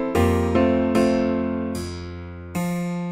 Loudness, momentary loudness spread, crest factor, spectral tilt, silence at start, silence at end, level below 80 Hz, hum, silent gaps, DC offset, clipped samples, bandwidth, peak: -22 LUFS; 13 LU; 16 dB; -7 dB/octave; 0 s; 0 s; -40 dBFS; none; none; under 0.1%; under 0.1%; 16 kHz; -6 dBFS